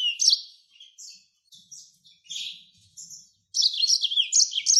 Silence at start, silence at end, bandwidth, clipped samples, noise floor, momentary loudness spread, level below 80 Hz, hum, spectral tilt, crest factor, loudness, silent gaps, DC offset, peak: 0 s; 0 s; 13 kHz; under 0.1%; -56 dBFS; 25 LU; -90 dBFS; none; 7 dB/octave; 20 dB; -21 LUFS; none; under 0.1%; -8 dBFS